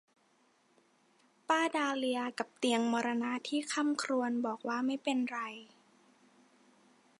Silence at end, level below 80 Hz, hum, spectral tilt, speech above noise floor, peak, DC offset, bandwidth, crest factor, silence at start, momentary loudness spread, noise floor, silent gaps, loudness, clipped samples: 1.55 s; -90 dBFS; none; -3 dB/octave; 37 dB; -16 dBFS; under 0.1%; 11.5 kHz; 20 dB; 1.5 s; 7 LU; -71 dBFS; none; -34 LUFS; under 0.1%